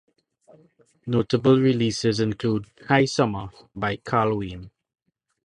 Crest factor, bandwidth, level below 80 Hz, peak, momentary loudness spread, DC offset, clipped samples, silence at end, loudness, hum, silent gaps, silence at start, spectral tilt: 22 dB; 10.5 kHz; -52 dBFS; -4 dBFS; 16 LU; under 0.1%; under 0.1%; 0.8 s; -23 LUFS; none; none; 1.05 s; -6 dB/octave